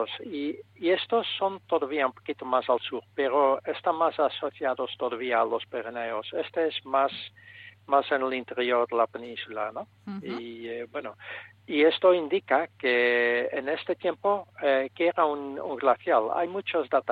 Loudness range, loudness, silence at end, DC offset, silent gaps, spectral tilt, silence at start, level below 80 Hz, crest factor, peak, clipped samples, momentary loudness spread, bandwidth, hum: 4 LU; -27 LUFS; 0 s; under 0.1%; none; -6.5 dB/octave; 0 s; -80 dBFS; 18 dB; -8 dBFS; under 0.1%; 13 LU; 4.9 kHz; none